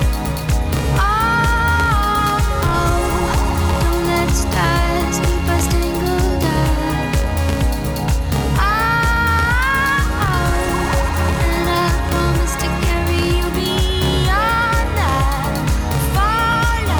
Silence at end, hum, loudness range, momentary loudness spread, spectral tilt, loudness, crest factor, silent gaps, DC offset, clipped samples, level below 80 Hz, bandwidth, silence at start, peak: 0 s; none; 1 LU; 4 LU; -5 dB/octave; -17 LUFS; 14 dB; none; under 0.1%; under 0.1%; -20 dBFS; over 20 kHz; 0 s; -2 dBFS